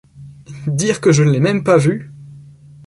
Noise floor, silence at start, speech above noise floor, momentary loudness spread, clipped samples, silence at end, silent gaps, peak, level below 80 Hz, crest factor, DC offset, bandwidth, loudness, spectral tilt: -40 dBFS; 0.15 s; 26 dB; 16 LU; under 0.1%; 0.45 s; none; -2 dBFS; -52 dBFS; 16 dB; under 0.1%; 11.5 kHz; -15 LUFS; -6 dB/octave